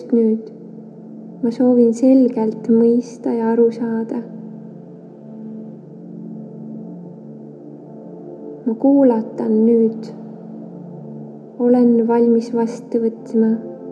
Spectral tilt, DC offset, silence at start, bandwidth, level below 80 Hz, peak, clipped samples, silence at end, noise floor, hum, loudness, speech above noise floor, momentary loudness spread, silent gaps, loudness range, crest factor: -8.5 dB/octave; under 0.1%; 0 s; 7.6 kHz; -86 dBFS; -4 dBFS; under 0.1%; 0 s; -37 dBFS; none; -16 LUFS; 22 dB; 23 LU; none; 18 LU; 16 dB